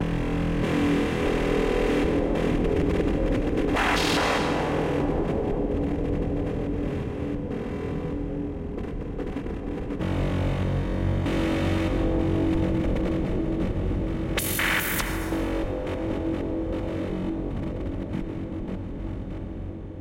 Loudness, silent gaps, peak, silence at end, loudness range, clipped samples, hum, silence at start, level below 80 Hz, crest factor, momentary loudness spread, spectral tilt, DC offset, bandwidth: -27 LUFS; none; -10 dBFS; 0 s; 7 LU; under 0.1%; none; 0 s; -34 dBFS; 14 dB; 9 LU; -6 dB/octave; under 0.1%; 16.5 kHz